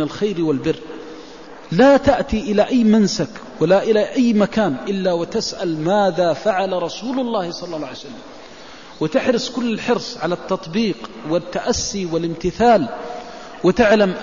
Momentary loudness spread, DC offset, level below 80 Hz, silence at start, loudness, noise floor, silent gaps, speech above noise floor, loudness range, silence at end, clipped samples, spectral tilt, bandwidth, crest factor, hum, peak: 20 LU; 0.6%; -44 dBFS; 0 s; -18 LUFS; -39 dBFS; none; 21 dB; 6 LU; 0 s; under 0.1%; -5.5 dB/octave; 7.4 kHz; 14 dB; none; -4 dBFS